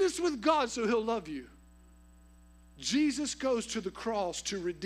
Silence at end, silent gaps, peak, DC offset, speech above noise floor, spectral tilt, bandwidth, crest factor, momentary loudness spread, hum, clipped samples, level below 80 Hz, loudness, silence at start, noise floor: 0 s; none; -14 dBFS; under 0.1%; 26 dB; -3.5 dB/octave; 14.5 kHz; 18 dB; 8 LU; 60 Hz at -60 dBFS; under 0.1%; -58 dBFS; -32 LUFS; 0 s; -57 dBFS